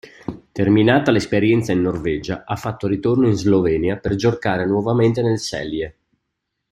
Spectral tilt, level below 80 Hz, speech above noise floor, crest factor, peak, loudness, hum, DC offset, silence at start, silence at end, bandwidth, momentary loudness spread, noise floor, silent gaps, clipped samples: -6.5 dB/octave; -46 dBFS; 59 dB; 16 dB; -2 dBFS; -19 LUFS; none; under 0.1%; 0.05 s; 0.8 s; 13 kHz; 11 LU; -77 dBFS; none; under 0.1%